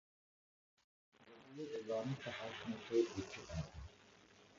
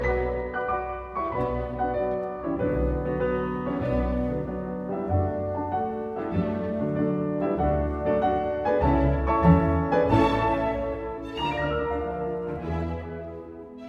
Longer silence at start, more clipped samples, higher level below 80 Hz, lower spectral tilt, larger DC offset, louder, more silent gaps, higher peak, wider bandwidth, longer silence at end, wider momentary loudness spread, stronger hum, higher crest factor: first, 1.2 s vs 0 s; neither; second, -64 dBFS vs -36 dBFS; second, -5.5 dB/octave vs -9 dB/octave; neither; second, -44 LUFS vs -26 LUFS; neither; second, -24 dBFS vs -8 dBFS; about the same, 7.4 kHz vs 7.8 kHz; about the same, 0 s vs 0 s; first, 26 LU vs 10 LU; neither; about the same, 22 dB vs 18 dB